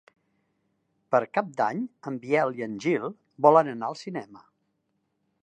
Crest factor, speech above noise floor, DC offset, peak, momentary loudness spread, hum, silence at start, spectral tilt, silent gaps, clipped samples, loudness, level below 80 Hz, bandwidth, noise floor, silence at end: 24 dB; 50 dB; under 0.1%; -4 dBFS; 17 LU; none; 1.1 s; -6.5 dB/octave; none; under 0.1%; -26 LUFS; -80 dBFS; 9.2 kHz; -76 dBFS; 1.05 s